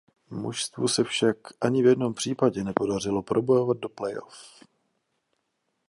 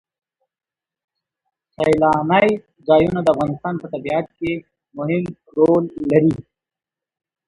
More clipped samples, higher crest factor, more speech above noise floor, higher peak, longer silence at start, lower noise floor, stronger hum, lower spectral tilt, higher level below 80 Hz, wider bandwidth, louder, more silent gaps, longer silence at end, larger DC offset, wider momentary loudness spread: neither; about the same, 22 dB vs 18 dB; second, 51 dB vs 72 dB; second, -4 dBFS vs 0 dBFS; second, 0.3 s vs 1.8 s; second, -77 dBFS vs -90 dBFS; neither; second, -5 dB/octave vs -8 dB/octave; second, -62 dBFS vs -50 dBFS; about the same, 11.5 kHz vs 11.5 kHz; second, -26 LUFS vs -18 LUFS; neither; first, 1.4 s vs 1.05 s; neither; about the same, 12 LU vs 11 LU